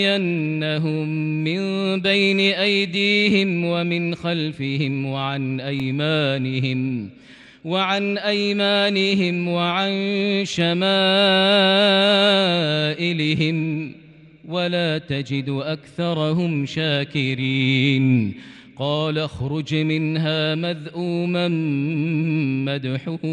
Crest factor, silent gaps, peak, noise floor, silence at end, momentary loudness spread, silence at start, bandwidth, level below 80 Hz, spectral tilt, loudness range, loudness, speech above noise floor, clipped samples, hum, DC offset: 16 dB; none; -6 dBFS; -44 dBFS; 0 s; 10 LU; 0 s; 10.5 kHz; -60 dBFS; -6 dB/octave; 7 LU; -20 LUFS; 24 dB; under 0.1%; none; under 0.1%